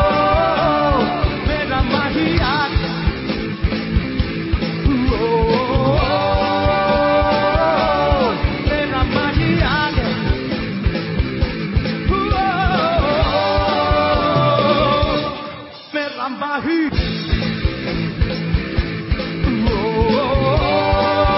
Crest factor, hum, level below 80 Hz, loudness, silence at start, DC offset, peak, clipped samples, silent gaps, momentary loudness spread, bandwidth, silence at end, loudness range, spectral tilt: 14 dB; none; -24 dBFS; -18 LUFS; 0 s; under 0.1%; -2 dBFS; under 0.1%; none; 7 LU; 5.8 kHz; 0 s; 4 LU; -10.5 dB/octave